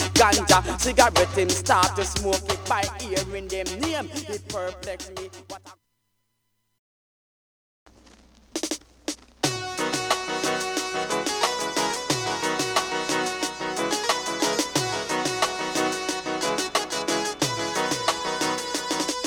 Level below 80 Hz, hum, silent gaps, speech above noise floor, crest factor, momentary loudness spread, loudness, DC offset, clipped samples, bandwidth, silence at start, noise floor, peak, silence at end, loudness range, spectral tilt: -44 dBFS; none; 6.79-7.86 s; 50 dB; 24 dB; 13 LU; -24 LUFS; under 0.1%; under 0.1%; over 20 kHz; 0 s; -74 dBFS; -2 dBFS; 0 s; 15 LU; -2.5 dB/octave